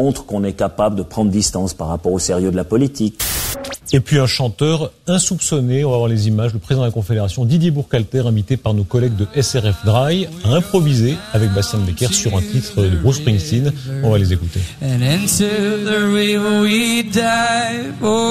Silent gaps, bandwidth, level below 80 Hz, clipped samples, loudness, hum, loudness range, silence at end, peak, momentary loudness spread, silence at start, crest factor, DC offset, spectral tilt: none; 15.5 kHz; -36 dBFS; under 0.1%; -17 LUFS; none; 2 LU; 0 s; -2 dBFS; 5 LU; 0 s; 14 dB; under 0.1%; -5 dB/octave